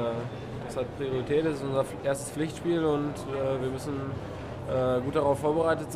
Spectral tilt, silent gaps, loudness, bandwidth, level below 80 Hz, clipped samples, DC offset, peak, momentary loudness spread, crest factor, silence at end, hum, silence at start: -6.5 dB/octave; none; -30 LUFS; 15.5 kHz; -52 dBFS; under 0.1%; under 0.1%; -12 dBFS; 10 LU; 16 dB; 0 s; none; 0 s